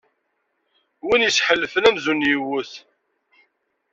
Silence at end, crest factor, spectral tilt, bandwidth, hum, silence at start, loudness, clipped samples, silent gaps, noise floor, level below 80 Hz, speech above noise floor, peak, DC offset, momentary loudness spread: 1.15 s; 20 dB; -2.5 dB/octave; 7.8 kHz; none; 1.05 s; -19 LUFS; under 0.1%; none; -72 dBFS; -60 dBFS; 53 dB; -2 dBFS; under 0.1%; 12 LU